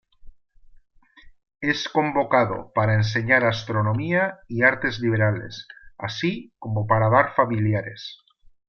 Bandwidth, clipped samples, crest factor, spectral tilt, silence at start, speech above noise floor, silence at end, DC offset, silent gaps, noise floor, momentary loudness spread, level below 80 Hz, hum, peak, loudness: 6.8 kHz; under 0.1%; 20 dB; -6.5 dB/octave; 0.25 s; 28 dB; 0.55 s; under 0.1%; none; -50 dBFS; 14 LU; -52 dBFS; none; -4 dBFS; -22 LUFS